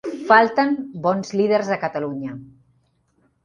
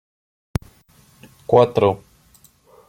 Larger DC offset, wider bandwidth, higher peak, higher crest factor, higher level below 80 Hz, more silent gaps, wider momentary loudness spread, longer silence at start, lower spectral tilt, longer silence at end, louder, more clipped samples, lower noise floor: neither; second, 10.5 kHz vs 15.5 kHz; about the same, 0 dBFS vs -2 dBFS; about the same, 20 dB vs 20 dB; second, -64 dBFS vs -46 dBFS; neither; about the same, 15 LU vs 17 LU; second, 0.05 s vs 1.5 s; second, -6 dB/octave vs -7.5 dB/octave; about the same, 1 s vs 0.95 s; about the same, -20 LUFS vs -19 LUFS; neither; first, -64 dBFS vs -54 dBFS